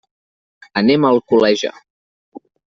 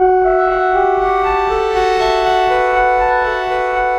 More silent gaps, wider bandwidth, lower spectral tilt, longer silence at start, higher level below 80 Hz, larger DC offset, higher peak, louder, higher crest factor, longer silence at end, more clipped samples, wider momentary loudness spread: first, 1.90-2.32 s vs none; second, 7.6 kHz vs 10 kHz; about the same, -5.5 dB/octave vs -4.5 dB/octave; first, 0.75 s vs 0 s; second, -58 dBFS vs -34 dBFS; neither; about the same, -2 dBFS vs -2 dBFS; about the same, -15 LUFS vs -14 LUFS; about the same, 16 dB vs 12 dB; first, 0.35 s vs 0 s; neither; first, 10 LU vs 3 LU